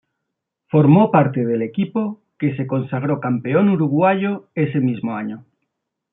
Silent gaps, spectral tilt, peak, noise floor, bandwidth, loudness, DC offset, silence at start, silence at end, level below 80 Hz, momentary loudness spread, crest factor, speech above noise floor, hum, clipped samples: none; -13 dB/octave; -2 dBFS; -79 dBFS; 3.9 kHz; -18 LUFS; under 0.1%; 0.75 s; 0.7 s; -64 dBFS; 11 LU; 16 dB; 62 dB; none; under 0.1%